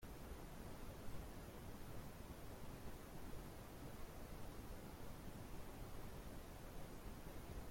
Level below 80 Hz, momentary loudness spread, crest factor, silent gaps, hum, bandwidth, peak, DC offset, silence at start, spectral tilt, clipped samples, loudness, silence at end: -58 dBFS; 1 LU; 16 dB; none; none; 16.5 kHz; -38 dBFS; under 0.1%; 0 s; -5.5 dB/octave; under 0.1%; -56 LUFS; 0 s